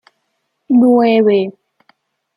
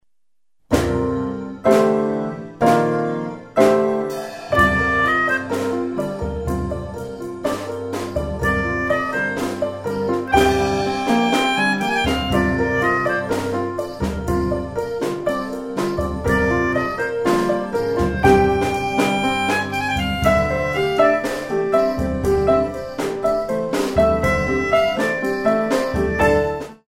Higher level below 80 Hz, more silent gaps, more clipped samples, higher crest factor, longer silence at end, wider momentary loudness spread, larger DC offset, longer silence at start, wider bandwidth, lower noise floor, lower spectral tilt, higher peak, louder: second, -66 dBFS vs -34 dBFS; neither; neither; second, 14 dB vs 20 dB; first, 0.85 s vs 0.15 s; about the same, 7 LU vs 9 LU; second, under 0.1% vs 0.1%; about the same, 0.7 s vs 0.7 s; second, 5.2 kHz vs 16.5 kHz; second, -69 dBFS vs -86 dBFS; first, -8.5 dB/octave vs -5.5 dB/octave; about the same, -2 dBFS vs 0 dBFS; first, -12 LUFS vs -19 LUFS